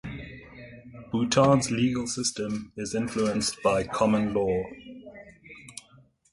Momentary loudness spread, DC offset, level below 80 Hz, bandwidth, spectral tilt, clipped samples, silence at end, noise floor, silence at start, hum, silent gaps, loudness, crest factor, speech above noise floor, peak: 24 LU; under 0.1%; -54 dBFS; 11.5 kHz; -5 dB/octave; under 0.1%; 0.5 s; -58 dBFS; 0.05 s; none; none; -26 LUFS; 20 dB; 33 dB; -8 dBFS